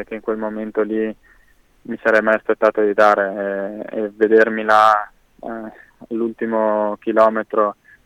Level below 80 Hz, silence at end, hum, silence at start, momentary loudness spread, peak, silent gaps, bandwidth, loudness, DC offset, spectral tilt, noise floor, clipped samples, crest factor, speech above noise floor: -58 dBFS; 0.35 s; none; 0 s; 17 LU; -2 dBFS; none; 11 kHz; -18 LUFS; under 0.1%; -6 dB/octave; -54 dBFS; under 0.1%; 16 dB; 36 dB